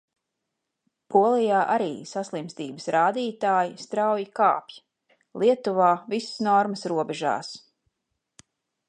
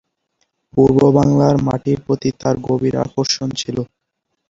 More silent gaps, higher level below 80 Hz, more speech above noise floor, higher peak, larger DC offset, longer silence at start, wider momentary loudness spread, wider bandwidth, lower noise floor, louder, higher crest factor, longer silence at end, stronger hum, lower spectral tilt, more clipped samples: neither; second, -80 dBFS vs -44 dBFS; about the same, 58 dB vs 59 dB; second, -6 dBFS vs -2 dBFS; neither; first, 1.1 s vs 0.75 s; about the same, 12 LU vs 11 LU; first, 10 kHz vs 7.8 kHz; first, -82 dBFS vs -74 dBFS; second, -24 LUFS vs -16 LUFS; about the same, 20 dB vs 16 dB; first, 1.3 s vs 0.65 s; neither; second, -5 dB/octave vs -6.5 dB/octave; neither